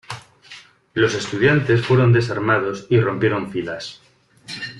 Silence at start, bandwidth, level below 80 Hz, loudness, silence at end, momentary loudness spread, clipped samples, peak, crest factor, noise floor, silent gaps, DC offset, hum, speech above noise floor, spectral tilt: 0.1 s; 11 kHz; -54 dBFS; -19 LUFS; 0 s; 17 LU; under 0.1%; -4 dBFS; 16 dB; -44 dBFS; none; under 0.1%; none; 26 dB; -6.5 dB/octave